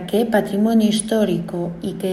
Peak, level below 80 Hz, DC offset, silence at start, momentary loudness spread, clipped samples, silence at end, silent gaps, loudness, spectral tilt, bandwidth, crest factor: -4 dBFS; -50 dBFS; under 0.1%; 0 s; 9 LU; under 0.1%; 0 s; none; -19 LUFS; -5.5 dB/octave; 13.5 kHz; 16 dB